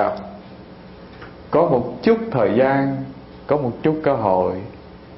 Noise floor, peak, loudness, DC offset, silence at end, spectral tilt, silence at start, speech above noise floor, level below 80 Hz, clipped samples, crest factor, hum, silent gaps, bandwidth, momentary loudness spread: -40 dBFS; -2 dBFS; -19 LUFS; under 0.1%; 0 s; -11.5 dB/octave; 0 s; 22 dB; -50 dBFS; under 0.1%; 18 dB; none; none; 5.8 kHz; 23 LU